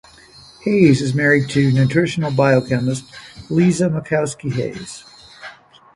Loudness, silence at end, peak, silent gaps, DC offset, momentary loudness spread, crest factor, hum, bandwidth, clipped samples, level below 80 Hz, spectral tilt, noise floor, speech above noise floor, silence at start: -17 LUFS; 0.45 s; 0 dBFS; none; under 0.1%; 22 LU; 18 dB; none; 11.5 kHz; under 0.1%; -50 dBFS; -6.5 dB/octave; -44 dBFS; 28 dB; 0.65 s